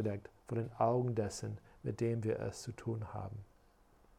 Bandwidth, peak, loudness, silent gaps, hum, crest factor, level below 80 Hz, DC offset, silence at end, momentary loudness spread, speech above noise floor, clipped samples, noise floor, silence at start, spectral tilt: 14 kHz; -18 dBFS; -39 LUFS; none; none; 20 dB; -64 dBFS; under 0.1%; 0.75 s; 13 LU; 29 dB; under 0.1%; -67 dBFS; 0 s; -7 dB/octave